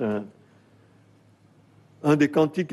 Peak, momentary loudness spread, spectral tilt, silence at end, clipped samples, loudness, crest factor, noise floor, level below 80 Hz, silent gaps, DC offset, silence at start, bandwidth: -10 dBFS; 13 LU; -7 dB/octave; 0 s; under 0.1%; -23 LUFS; 18 dB; -57 dBFS; -68 dBFS; none; under 0.1%; 0 s; 12.5 kHz